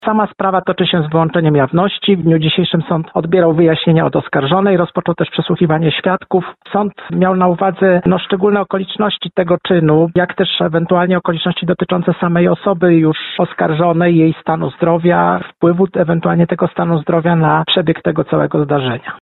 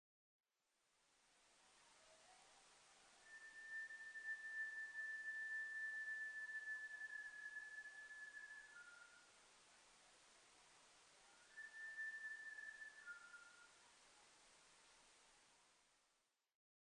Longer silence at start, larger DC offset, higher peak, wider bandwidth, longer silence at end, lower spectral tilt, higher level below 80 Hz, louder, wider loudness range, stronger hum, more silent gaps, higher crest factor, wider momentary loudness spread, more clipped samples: second, 0 s vs 1.2 s; neither; first, -2 dBFS vs -42 dBFS; second, 4.2 kHz vs 10 kHz; second, 0.05 s vs 1.05 s; first, -11.5 dB/octave vs 1 dB/octave; first, -48 dBFS vs under -90 dBFS; first, -14 LUFS vs -52 LUFS; second, 2 LU vs 15 LU; neither; neither; about the same, 12 dB vs 14 dB; second, 5 LU vs 21 LU; neither